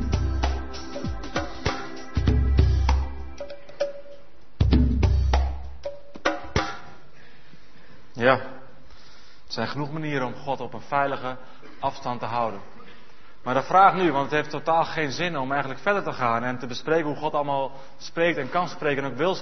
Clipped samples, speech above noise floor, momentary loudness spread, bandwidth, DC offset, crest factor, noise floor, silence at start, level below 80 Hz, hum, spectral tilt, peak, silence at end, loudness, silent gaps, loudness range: under 0.1%; 27 dB; 14 LU; 6.4 kHz; 2%; 24 dB; -52 dBFS; 0 s; -32 dBFS; none; -6.5 dB/octave; -2 dBFS; 0 s; -25 LUFS; none; 6 LU